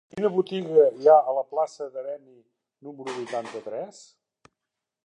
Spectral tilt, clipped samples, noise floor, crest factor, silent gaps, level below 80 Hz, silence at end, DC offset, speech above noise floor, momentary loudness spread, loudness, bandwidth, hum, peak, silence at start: -6 dB/octave; under 0.1%; -86 dBFS; 20 dB; none; -78 dBFS; 1.15 s; under 0.1%; 61 dB; 20 LU; -24 LUFS; 9.8 kHz; none; -6 dBFS; 0.15 s